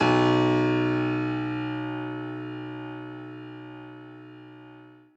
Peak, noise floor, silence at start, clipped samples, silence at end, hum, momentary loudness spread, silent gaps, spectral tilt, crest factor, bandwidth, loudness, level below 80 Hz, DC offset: -10 dBFS; -50 dBFS; 0 s; under 0.1%; 0.2 s; none; 24 LU; none; -7 dB/octave; 18 dB; 8 kHz; -27 LUFS; -60 dBFS; under 0.1%